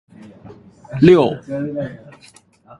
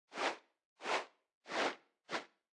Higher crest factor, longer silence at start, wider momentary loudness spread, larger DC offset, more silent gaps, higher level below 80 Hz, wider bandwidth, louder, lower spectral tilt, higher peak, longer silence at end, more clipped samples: about the same, 18 dB vs 20 dB; first, 0.25 s vs 0.1 s; first, 18 LU vs 14 LU; neither; second, none vs 0.65-0.76 s, 1.34-1.41 s; first, -50 dBFS vs under -90 dBFS; about the same, 11 kHz vs 12 kHz; first, -16 LUFS vs -41 LUFS; first, -8 dB/octave vs -1.5 dB/octave; first, 0 dBFS vs -24 dBFS; first, 0.85 s vs 0.3 s; neither